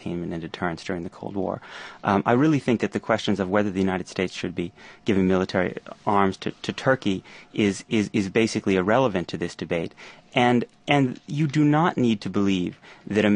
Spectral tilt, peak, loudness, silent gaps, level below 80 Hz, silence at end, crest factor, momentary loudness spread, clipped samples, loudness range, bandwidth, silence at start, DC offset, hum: -6.5 dB/octave; -4 dBFS; -24 LUFS; none; -52 dBFS; 0 s; 20 dB; 11 LU; under 0.1%; 2 LU; 10 kHz; 0 s; under 0.1%; none